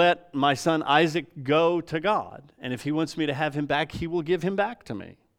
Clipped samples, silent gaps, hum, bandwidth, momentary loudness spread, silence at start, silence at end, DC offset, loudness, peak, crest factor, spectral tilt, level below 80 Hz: under 0.1%; none; none; 15.5 kHz; 13 LU; 0 s; 0.25 s; under 0.1%; -25 LUFS; -6 dBFS; 20 dB; -5.5 dB/octave; -58 dBFS